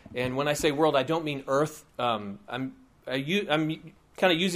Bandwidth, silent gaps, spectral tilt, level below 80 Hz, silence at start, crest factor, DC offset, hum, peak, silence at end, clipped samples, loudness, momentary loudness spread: 15.5 kHz; none; -4.5 dB/octave; -58 dBFS; 0.05 s; 20 dB; under 0.1%; none; -8 dBFS; 0 s; under 0.1%; -28 LUFS; 11 LU